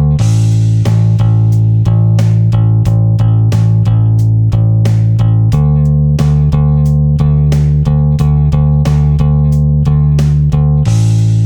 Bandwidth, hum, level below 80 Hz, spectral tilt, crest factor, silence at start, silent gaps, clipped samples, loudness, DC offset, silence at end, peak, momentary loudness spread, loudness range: 8.8 kHz; none; -20 dBFS; -8.5 dB/octave; 8 dB; 0 s; none; under 0.1%; -10 LUFS; under 0.1%; 0 s; 0 dBFS; 1 LU; 0 LU